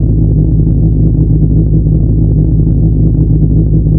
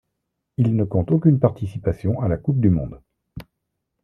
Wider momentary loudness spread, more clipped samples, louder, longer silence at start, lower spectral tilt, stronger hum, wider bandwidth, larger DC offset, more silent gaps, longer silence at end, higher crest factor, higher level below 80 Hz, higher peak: second, 1 LU vs 18 LU; first, 0.5% vs under 0.1%; first, -10 LUFS vs -21 LUFS; second, 0 s vs 0.6 s; first, -17 dB/octave vs -11.5 dB/octave; neither; second, 1 kHz vs 5 kHz; first, 0.4% vs under 0.1%; neither; second, 0 s vs 0.6 s; second, 8 dB vs 18 dB; first, -12 dBFS vs -44 dBFS; about the same, 0 dBFS vs -2 dBFS